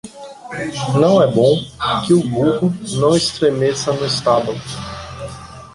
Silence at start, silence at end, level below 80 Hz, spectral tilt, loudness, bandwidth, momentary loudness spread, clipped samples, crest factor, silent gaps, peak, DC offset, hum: 0.05 s; 0.05 s; -46 dBFS; -5.5 dB/octave; -16 LUFS; 11.5 kHz; 17 LU; under 0.1%; 16 dB; none; -2 dBFS; under 0.1%; none